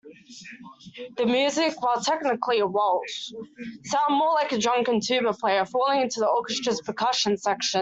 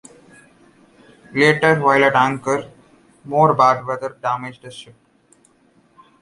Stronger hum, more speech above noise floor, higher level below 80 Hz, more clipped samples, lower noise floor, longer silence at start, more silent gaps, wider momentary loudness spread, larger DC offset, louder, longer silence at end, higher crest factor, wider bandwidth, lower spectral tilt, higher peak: neither; second, 21 dB vs 40 dB; second, -70 dBFS vs -60 dBFS; neither; second, -45 dBFS vs -57 dBFS; second, 0.05 s vs 1.3 s; neither; about the same, 17 LU vs 18 LU; neither; second, -24 LUFS vs -17 LUFS; second, 0 s vs 1.4 s; about the same, 16 dB vs 20 dB; second, 8.2 kHz vs 11.5 kHz; second, -3 dB/octave vs -5.5 dB/octave; second, -10 dBFS vs 0 dBFS